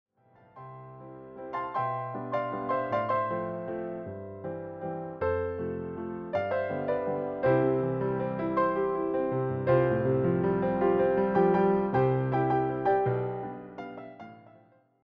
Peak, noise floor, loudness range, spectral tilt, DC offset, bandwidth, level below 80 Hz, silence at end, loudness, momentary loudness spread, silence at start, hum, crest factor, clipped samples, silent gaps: -10 dBFS; -61 dBFS; 7 LU; -7.5 dB/octave; under 0.1%; 5.2 kHz; -58 dBFS; 0.65 s; -29 LUFS; 17 LU; 0.55 s; none; 18 dB; under 0.1%; none